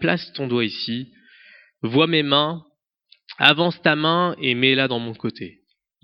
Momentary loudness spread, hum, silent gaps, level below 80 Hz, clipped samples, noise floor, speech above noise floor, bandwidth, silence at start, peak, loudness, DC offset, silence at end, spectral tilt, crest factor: 15 LU; none; none; -66 dBFS; under 0.1%; -59 dBFS; 39 dB; 8.2 kHz; 0 s; 0 dBFS; -20 LUFS; under 0.1%; 0.55 s; -7 dB/octave; 22 dB